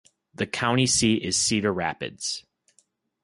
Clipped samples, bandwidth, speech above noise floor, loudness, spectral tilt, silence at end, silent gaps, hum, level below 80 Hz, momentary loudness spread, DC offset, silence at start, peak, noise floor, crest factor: under 0.1%; 11.5 kHz; 42 dB; -24 LUFS; -3 dB/octave; 0.85 s; none; none; -54 dBFS; 11 LU; under 0.1%; 0.4 s; -8 dBFS; -67 dBFS; 18 dB